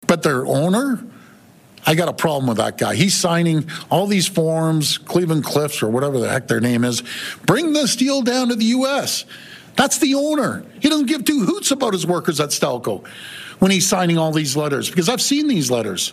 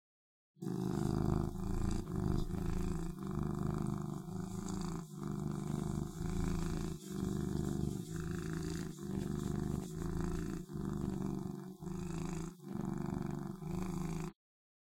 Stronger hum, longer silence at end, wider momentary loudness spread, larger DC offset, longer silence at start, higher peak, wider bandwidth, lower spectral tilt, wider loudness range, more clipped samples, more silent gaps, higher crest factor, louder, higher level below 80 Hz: neither; second, 0 s vs 0.65 s; about the same, 7 LU vs 6 LU; neither; second, 0 s vs 0.6 s; first, -2 dBFS vs -20 dBFS; about the same, 16 kHz vs 16.5 kHz; second, -4 dB/octave vs -7 dB/octave; about the same, 1 LU vs 3 LU; neither; neither; about the same, 18 dB vs 20 dB; first, -18 LUFS vs -40 LUFS; second, -58 dBFS vs -46 dBFS